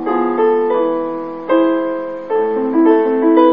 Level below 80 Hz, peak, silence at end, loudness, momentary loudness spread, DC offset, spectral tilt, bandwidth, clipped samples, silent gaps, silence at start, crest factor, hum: -60 dBFS; 0 dBFS; 0 s; -15 LUFS; 9 LU; 0.6%; -9 dB/octave; 3.9 kHz; under 0.1%; none; 0 s; 14 dB; none